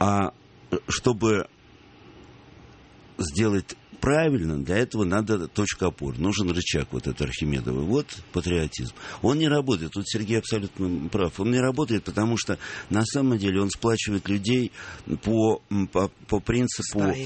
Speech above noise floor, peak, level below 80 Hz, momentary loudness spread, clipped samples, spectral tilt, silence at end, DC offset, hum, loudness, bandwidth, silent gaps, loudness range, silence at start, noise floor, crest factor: 26 dB; -6 dBFS; -44 dBFS; 8 LU; under 0.1%; -5.5 dB/octave; 0 s; under 0.1%; none; -26 LUFS; 8.8 kHz; none; 3 LU; 0 s; -51 dBFS; 20 dB